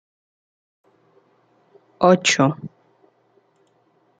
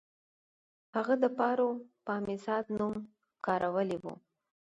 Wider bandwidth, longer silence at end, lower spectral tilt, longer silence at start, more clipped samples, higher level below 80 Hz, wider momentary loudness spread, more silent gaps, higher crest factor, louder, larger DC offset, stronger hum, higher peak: about the same, 9.6 kHz vs 8.8 kHz; first, 1.5 s vs 0.65 s; second, -4 dB/octave vs -7.5 dB/octave; first, 2 s vs 0.95 s; neither; about the same, -68 dBFS vs -72 dBFS; first, 20 LU vs 13 LU; neither; about the same, 22 dB vs 18 dB; first, -17 LUFS vs -33 LUFS; neither; neither; first, -2 dBFS vs -16 dBFS